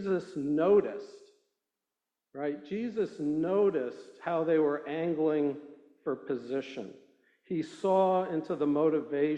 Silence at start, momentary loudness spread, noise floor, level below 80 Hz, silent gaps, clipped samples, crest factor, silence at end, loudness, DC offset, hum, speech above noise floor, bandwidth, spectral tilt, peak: 0 s; 14 LU; -89 dBFS; -74 dBFS; none; under 0.1%; 16 dB; 0 s; -30 LUFS; under 0.1%; none; 59 dB; 9.2 kHz; -8 dB/octave; -14 dBFS